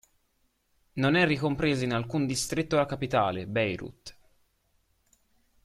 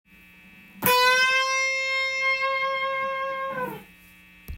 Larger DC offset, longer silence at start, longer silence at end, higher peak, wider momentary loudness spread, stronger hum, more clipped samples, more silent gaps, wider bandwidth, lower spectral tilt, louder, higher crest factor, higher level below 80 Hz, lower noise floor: neither; first, 0.95 s vs 0.55 s; first, 1.55 s vs 0 s; second, -8 dBFS vs 0 dBFS; first, 16 LU vs 12 LU; neither; neither; neither; second, 14.5 kHz vs 16 kHz; first, -5 dB/octave vs -1.5 dB/octave; second, -27 LUFS vs -22 LUFS; about the same, 22 dB vs 26 dB; about the same, -56 dBFS vs -54 dBFS; first, -72 dBFS vs -52 dBFS